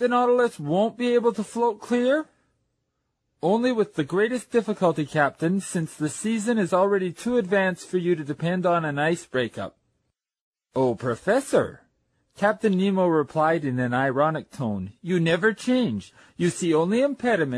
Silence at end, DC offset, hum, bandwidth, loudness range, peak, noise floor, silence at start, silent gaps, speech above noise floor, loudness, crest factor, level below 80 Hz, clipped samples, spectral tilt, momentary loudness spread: 0 s; under 0.1%; none; 13 kHz; 3 LU; -8 dBFS; -77 dBFS; 0 s; 10.41-10.52 s; 54 dB; -24 LUFS; 16 dB; -64 dBFS; under 0.1%; -6 dB/octave; 7 LU